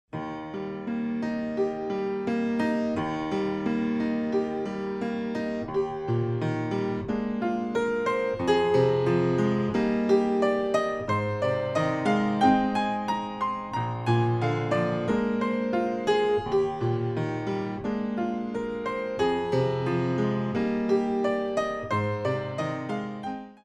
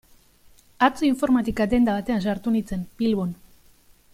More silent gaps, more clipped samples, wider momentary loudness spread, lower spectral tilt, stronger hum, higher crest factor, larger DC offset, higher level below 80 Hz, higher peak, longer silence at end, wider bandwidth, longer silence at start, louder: neither; neither; about the same, 7 LU vs 8 LU; about the same, -7.5 dB/octave vs -6.5 dB/octave; neither; about the same, 16 dB vs 20 dB; neither; second, -56 dBFS vs -46 dBFS; second, -10 dBFS vs -4 dBFS; second, 0.1 s vs 0.8 s; second, 10 kHz vs 15.5 kHz; second, 0.15 s vs 0.8 s; second, -27 LUFS vs -23 LUFS